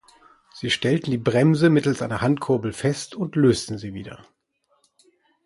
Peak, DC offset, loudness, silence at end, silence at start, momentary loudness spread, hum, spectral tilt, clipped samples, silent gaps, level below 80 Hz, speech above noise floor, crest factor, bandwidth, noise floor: -6 dBFS; under 0.1%; -22 LUFS; 1.3 s; 0.55 s; 15 LU; none; -6 dB/octave; under 0.1%; none; -54 dBFS; 47 dB; 18 dB; 11.5 kHz; -69 dBFS